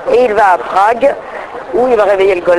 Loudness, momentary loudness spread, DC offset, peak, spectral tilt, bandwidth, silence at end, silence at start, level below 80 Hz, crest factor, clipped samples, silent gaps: -11 LUFS; 13 LU; under 0.1%; 0 dBFS; -5 dB/octave; 12 kHz; 0 s; 0 s; -44 dBFS; 10 dB; under 0.1%; none